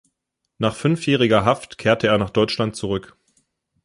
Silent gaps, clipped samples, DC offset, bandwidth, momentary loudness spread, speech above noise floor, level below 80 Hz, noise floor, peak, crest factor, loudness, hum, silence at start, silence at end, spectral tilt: none; under 0.1%; under 0.1%; 11.5 kHz; 9 LU; 59 dB; -50 dBFS; -78 dBFS; -2 dBFS; 18 dB; -20 LUFS; none; 0.6 s; 0.85 s; -6 dB/octave